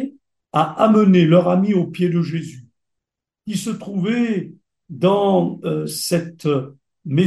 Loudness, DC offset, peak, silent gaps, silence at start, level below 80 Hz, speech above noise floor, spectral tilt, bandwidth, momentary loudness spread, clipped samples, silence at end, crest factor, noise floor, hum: -18 LUFS; under 0.1%; -2 dBFS; none; 0 s; -64 dBFS; 66 dB; -6.5 dB/octave; 12.5 kHz; 18 LU; under 0.1%; 0 s; 16 dB; -83 dBFS; none